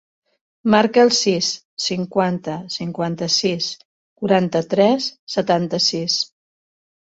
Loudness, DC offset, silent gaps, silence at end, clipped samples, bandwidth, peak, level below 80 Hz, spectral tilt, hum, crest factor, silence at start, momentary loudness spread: -19 LUFS; under 0.1%; 1.65-1.77 s, 3.85-4.16 s, 5.19-5.27 s; 0.95 s; under 0.1%; 8 kHz; -2 dBFS; -60 dBFS; -4 dB/octave; none; 18 dB; 0.65 s; 11 LU